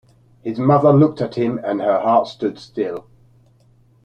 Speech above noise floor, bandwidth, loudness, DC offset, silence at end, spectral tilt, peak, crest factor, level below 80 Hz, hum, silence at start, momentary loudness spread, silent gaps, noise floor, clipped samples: 37 dB; 6.8 kHz; -18 LUFS; under 0.1%; 1.05 s; -9 dB/octave; -2 dBFS; 16 dB; -58 dBFS; none; 0.45 s; 13 LU; none; -54 dBFS; under 0.1%